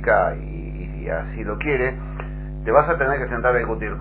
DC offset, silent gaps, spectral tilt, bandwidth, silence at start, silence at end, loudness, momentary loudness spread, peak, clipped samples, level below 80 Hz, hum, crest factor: under 0.1%; none; -10.5 dB/octave; 4 kHz; 0 s; 0 s; -22 LUFS; 14 LU; -2 dBFS; under 0.1%; -32 dBFS; none; 20 dB